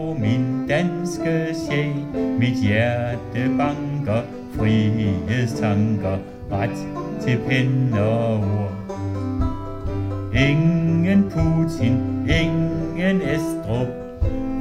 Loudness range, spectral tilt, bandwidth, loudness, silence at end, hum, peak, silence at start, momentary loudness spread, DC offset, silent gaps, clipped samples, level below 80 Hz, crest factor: 3 LU; -7.5 dB/octave; 13.5 kHz; -22 LUFS; 0 s; none; -4 dBFS; 0 s; 8 LU; under 0.1%; none; under 0.1%; -36 dBFS; 16 dB